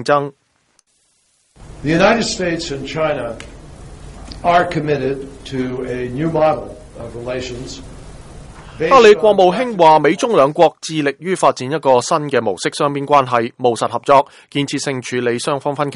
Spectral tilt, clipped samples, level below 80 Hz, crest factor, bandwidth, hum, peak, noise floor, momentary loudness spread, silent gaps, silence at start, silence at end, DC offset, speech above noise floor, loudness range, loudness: -5 dB/octave; under 0.1%; -42 dBFS; 16 dB; 11.5 kHz; none; 0 dBFS; -61 dBFS; 16 LU; none; 0 s; 0 s; under 0.1%; 45 dB; 8 LU; -15 LUFS